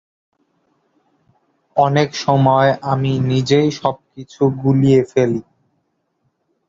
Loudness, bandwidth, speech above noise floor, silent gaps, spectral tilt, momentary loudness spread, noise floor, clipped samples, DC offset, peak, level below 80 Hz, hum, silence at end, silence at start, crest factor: -16 LUFS; 7.6 kHz; 53 dB; none; -7 dB/octave; 9 LU; -68 dBFS; under 0.1%; under 0.1%; -2 dBFS; -54 dBFS; none; 1.3 s; 1.75 s; 16 dB